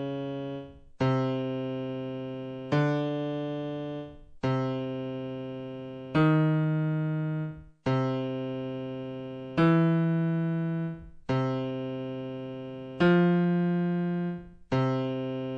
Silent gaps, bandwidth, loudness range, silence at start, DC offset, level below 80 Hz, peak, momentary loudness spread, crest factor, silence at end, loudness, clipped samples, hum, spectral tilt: none; 6.6 kHz; 4 LU; 0 s; under 0.1%; -60 dBFS; -12 dBFS; 14 LU; 16 dB; 0 s; -29 LUFS; under 0.1%; none; -9 dB/octave